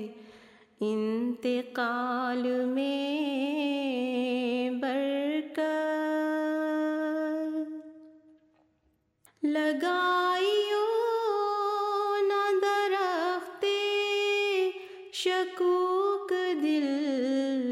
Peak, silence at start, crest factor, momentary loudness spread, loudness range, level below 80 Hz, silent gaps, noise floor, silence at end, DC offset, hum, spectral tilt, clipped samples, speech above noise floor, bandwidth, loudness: -18 dBFS; 0 s; 12 dB; 5 LU; 4 LU; -84 dBFS; none; -72 dBFS; 0 s; under 0.1%; none; -4 dB/octave; under 0.1%; 43 dB; 15.5 kHz; -29 LUFS